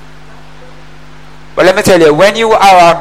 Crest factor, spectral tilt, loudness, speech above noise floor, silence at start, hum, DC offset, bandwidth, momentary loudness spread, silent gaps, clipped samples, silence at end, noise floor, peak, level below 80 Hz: 8 dB; -4 dB/octave; -6 LUFS; 29 dB; 1.55 s; none; 3%; 16.5 kHz; 6 LU; none; 0.3%; 0 s; -35 dBFS; 0 dBFS; -38 dBFS